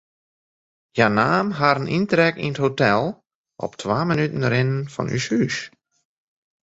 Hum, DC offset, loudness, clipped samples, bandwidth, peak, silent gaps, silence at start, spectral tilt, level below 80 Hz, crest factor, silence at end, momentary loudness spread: none; under 0.1%; -21 LUFS; under 0.1%; 8 kHz; -2 dBFS; 3.35-3.44 s; 0.95 s; -6 dB/octave; -56 dBFS; 20 dB; 0.95 s; 11 LU